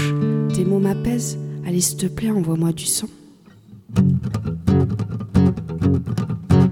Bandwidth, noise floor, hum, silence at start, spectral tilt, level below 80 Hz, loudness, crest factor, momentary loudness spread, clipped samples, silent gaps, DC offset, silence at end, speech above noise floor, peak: 17 kHz; -47 dBFS; none; 0 s; -6 dB/octave; -40 dBFS; -20 LUFS; 18 dB; 7 LU; under 0.1%; none; under 0.1%; 0 s; 27 dB; -2 dBFS